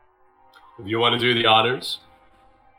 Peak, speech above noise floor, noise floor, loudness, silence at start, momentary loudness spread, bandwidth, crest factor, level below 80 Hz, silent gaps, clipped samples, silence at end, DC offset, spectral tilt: -4 dBFS; 36 dB; -57 dBFS; -19 LUFS; 0.8 s; 16 LU; 16.5 kHz; 20 dB; -64 dBFS; none; under 0.1%; 0.8 s; under 0.1%; -4.5 dB/octave